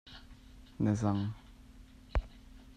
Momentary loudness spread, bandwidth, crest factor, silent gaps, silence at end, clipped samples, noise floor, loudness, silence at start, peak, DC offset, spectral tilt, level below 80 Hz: 26 LU; 9.6 kHz; 20 dB; none; 0.05 s; under 0.1%; -55 dBFS; -35 LUFS; 0.05 s; -18 dBFS; under 0.1%; -7.5 dB/octave; -44 dBFS